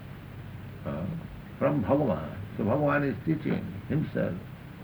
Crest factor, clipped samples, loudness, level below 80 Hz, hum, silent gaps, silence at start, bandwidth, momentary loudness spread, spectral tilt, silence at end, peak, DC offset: 18 dB; under 0.1%; -30 LUFS; -52 dBFS; none; none; 0 s; over 20 kHz; 17 LU; -9.5 dB/octave; 0 s; -12 dBFS; under 0.1%